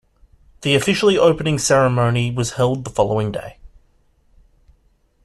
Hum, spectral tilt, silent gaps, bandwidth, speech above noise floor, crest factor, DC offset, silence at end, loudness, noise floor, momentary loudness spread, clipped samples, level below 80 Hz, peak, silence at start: none; -5 dB/octave; none; 13 kHz; 42 dB; 18 dB; under 0.1%; 1.6 s; -17 LUFS; -59 dBFS; 11 LU; under 0.1%; -46 dBFS; -2 dBFS; 0.6 s